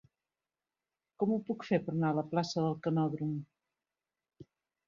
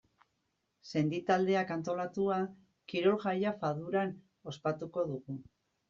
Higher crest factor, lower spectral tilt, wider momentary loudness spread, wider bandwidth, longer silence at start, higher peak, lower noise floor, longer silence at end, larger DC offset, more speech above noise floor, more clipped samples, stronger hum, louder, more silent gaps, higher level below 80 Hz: about the same, 20 dB vs 18 dB; first, -7.5 dB/octave vs -5.5 dB/octave; second, 5 LU vs 11 LU; about the same, 7.4 kHz vs 7.4 kHz; first, 1.2 s vs 0.85 s; about the same, -16 dBFS vs -16 dBFS; first, under -90 dBFS vs -81 dBFS; about the same, 0.45 s vs 0.5 s; neither; first, over 57 dB vs 48 dB; neither; neither; about the same, -34 LUFS vs -34 LUFS; neither; about the same, -76 dBFS vs -74 dBFS